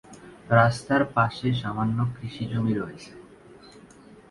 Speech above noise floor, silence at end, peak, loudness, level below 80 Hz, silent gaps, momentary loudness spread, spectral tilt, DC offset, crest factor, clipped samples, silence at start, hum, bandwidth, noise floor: 26 dB; 0.5 s; -4 dBFS; -25 LUFS; -54 dBFS; none; 18 LU; -7 dB/octave; under 0.1%; 24 dB; under 0.1%; 0.1 s; none; 11.5 kHz; -50 dBFS